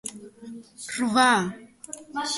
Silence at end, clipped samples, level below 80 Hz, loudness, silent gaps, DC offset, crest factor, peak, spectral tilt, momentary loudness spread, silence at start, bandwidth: 0 s; under 0.1%; -68 dBFS; -23 LUFS; none; under 0.1%; 22 dB; -6 dBFS; -3 dB/octave; 23 LU; 0.05 s; 12 kHz